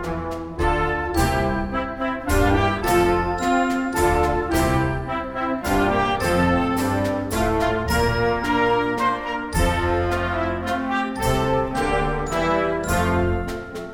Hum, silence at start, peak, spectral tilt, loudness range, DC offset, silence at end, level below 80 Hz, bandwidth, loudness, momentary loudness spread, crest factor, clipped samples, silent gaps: none; 0 s; -6 dBFS; -5.5 dB/octave; 2 LU; under 0.1%; 0 s; -32 dBFS; 18 kHz; -22 LUFS; 6 LU; 16 dB; under 0.1%; none